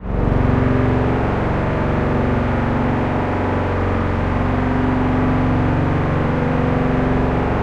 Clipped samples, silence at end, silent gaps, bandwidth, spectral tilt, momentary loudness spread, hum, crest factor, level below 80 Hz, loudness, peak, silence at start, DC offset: under 0.1%; 0 s; none; 7.6 kHz; -9 dB/octave; 3 LU; none; 12 dB; -26 dBFS; -18 LUFS; -4 dBFS; 0 s; under 0.1%